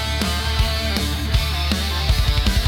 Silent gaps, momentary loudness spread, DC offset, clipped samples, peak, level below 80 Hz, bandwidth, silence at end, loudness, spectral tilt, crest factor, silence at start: none; 2 LU; under 0.1%; under 0.1%; -2 dBFS; -22 dBFS; 17.5 kHz; 0 s; -20 LUFS; -4 dB/octave; 18 dB; 0 s